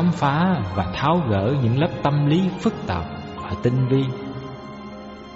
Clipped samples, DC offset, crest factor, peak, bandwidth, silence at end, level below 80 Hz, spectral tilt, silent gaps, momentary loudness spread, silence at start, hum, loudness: under 0.1%; under 0.1%; 14 dB; -8 dBFS; 8 kHz; 0 s; -46 dBFS; -6.5 dB/octave; none; 16 LU; 0 s; none; -22 LUFS